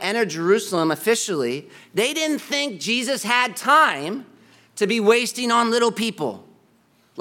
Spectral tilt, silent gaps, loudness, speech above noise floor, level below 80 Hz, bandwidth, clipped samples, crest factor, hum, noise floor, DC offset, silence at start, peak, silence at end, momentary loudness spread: -3 dB/octave; none; -20 LUFS; 39 dB; -76 dBFS; 17.5 kHz; under 0.1%; 20 dB; none; -59 dBFS; under 0.1%; 0 s; -2 dBFS; 0 s; 12 LU